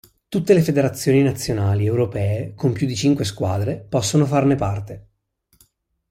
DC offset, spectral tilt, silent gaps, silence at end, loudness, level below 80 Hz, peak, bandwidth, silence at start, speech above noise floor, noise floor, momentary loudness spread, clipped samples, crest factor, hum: under 0.1%; -6.5 dB/octave; none; 1.1 s; -20 LUFS; -48 dBFS; -4 dBFS; 16 kHz; 0.3 s; 46 dB; -64 dBFS; 8 LU; under 0.1%; 16 dB; none